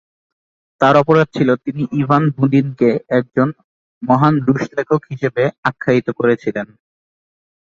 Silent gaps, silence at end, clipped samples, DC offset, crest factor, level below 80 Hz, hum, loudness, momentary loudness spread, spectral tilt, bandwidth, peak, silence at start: 3.64-4.01 s, 5.58-5.63 s; 1.1 s; under 0.1%; under 0.1%; 16 dB; -56 dBFS; none; -16 LUFS; 7 LU; -8.5 dB/octave; 7.4 kHz; 0 dBFS; 0.8 s